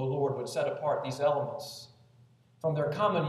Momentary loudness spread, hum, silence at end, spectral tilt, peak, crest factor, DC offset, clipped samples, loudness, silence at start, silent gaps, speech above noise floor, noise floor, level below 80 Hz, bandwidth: 11 LU; none; 0 s; -6 dB/octave; -14 dBFS; 16 dB; under 0.1%; under 0.1%; -31 LUFS; 0 s; none; 31 dB; -61 dBFS; -74 dBFS; 14 kHz